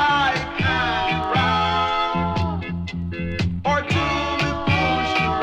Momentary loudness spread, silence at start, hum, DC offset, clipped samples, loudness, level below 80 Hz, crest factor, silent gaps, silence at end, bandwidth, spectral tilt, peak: 8 LU; 0 s; none; under 0.1%; under 0.1%; -21 LUFS; -38 dBFS; 14 dB; none; 0 s; 10 kHz; -5.5 dB/octave; -6 dBFS